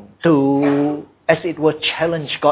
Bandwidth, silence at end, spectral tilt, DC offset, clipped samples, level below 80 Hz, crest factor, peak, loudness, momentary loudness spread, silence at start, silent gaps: 4 kHz; 0 s; -10.5 dB/octave; under 0.1%; under 0.1%; -56 dBFS; 16 dB; 0 dBFS; -18 LUFS; 6 LU; 0 s; none